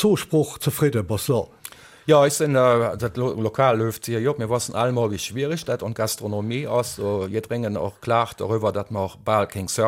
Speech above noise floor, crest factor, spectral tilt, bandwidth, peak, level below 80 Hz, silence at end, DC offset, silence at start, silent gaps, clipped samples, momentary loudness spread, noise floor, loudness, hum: 21 dB; 18 dB; -5.5 dB/octave; 16.5 kHz; -4 dBFS; -54 dBFS; 0 s; under 0.1%; 0 s; none; under 0.1%; 9 LU; -43 dBFS; -23 LUFS; none